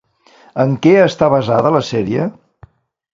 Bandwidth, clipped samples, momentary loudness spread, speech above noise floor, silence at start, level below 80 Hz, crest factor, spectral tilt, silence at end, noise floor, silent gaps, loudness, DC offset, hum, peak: 7.6 kHz; under 0.1%; 9 LU; 35 dB; 0.55 s; -50 dBFS; 16 dB; -7 dB/octave; 0.85 s; -48 dBFS; none; -14 LUFS; under 0.1%; none; 0 dBFS